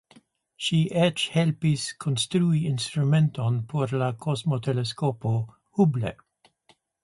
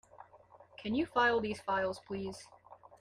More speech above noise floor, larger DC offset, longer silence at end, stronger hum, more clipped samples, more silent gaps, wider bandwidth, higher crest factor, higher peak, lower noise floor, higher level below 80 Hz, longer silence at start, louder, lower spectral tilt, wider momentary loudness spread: first, 39 dB vs 26 dB; neither; first, 0.9 s vs 0.25 s; neither; neither; neither; second, 11.5 kHz vs 14 kHz; about the same, 18 dB vs 20 dB; first, -8 dBFS vs -16 dBFS; first, -64 dBFS vs -60 dBFS; first, -60 dBFS vs -68 dBFS; first, 0.6 s vs 0.2 s; first, -25 LUFS vs -34 LUFS; about the same, -6 dB/octave vs -5 dB/octave; second, 6 LU vs 16 LU